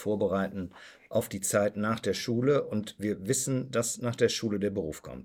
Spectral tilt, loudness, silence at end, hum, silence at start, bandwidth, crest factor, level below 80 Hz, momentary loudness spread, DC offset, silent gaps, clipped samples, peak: -4.5 dB/octave; -30 LUFS; 0 s; none; 0 s; 17.5 kHz; 18 dB; -62 dBFS; 8 LU; under 0.1%; none; under 0.1%; -12 dBFS